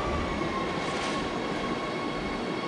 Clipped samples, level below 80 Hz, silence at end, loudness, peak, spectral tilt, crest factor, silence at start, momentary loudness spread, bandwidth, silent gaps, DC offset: under 0.1%; -44 dBFS; 0 s; -30 LUFS; -18 dBFS; -5 dB/octave; 12 dB; 0 s; 2 LU; 11.5 kHz; none; under 0.1%